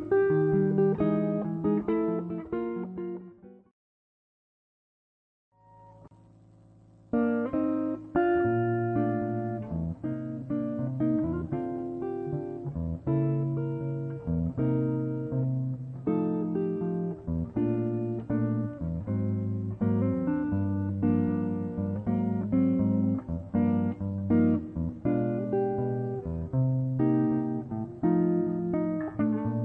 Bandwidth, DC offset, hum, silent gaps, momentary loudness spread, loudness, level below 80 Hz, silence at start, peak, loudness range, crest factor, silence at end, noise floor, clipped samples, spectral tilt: 3.9 kHz; under 0.1%; none; 3.71-5.52 s; 9 LU; -29 LUFS; -52 dBFS; 0 s; -14 dBFS; 5 LU; 16 dB; 0 s; -56 dBFS; under 0.1%; -12 dB/octave